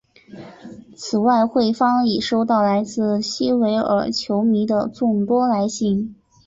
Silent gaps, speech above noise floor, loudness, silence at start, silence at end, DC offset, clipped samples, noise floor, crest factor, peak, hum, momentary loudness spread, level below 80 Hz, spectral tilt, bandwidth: none; 22 dB; -19 LUFS; 0.3 s; 0.35 s; under 0.1%; under 0.1%; -40 dBFS; 14 dB; -6 dBFS; none; 6 LU; -56 dBFS; -5.5 dB/octave; 7.8 kHz